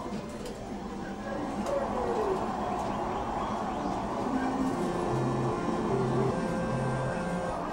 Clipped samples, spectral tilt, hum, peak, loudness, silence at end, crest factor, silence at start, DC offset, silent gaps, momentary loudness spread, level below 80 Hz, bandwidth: under 0.1%; -6.5 dB/octave; none; -16 dBFS; -31 LUFS; 0 s; 14 dB; 0 s; under 0.1%; none; 8 LU; -48 dBFS; 16 kHz